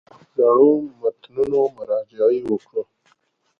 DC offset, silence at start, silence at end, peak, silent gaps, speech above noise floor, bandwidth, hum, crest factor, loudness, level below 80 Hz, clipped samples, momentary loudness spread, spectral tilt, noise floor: under 0.1%; 0.4 s; 0.75 s; -4 dBFS; none; 46 dB; 4.5 kHz; none; 16 dB; -20 LUFS; -62 dBFS; under 0.1%; 15 LU; -9 dB/octave; -64 dBFS